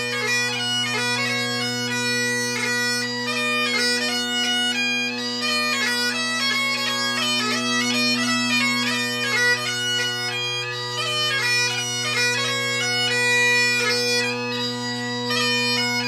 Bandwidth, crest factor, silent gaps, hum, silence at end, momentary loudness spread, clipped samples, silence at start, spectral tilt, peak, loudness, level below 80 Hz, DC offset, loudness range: 15.5 kHz; 14 dB; none; none; 0 s; 5 LU; under 0.1%; 0 s; -2 dB/octave; -8 dBFS; -20 LUFS; -72 dBFS; under 0.1%; 2 LU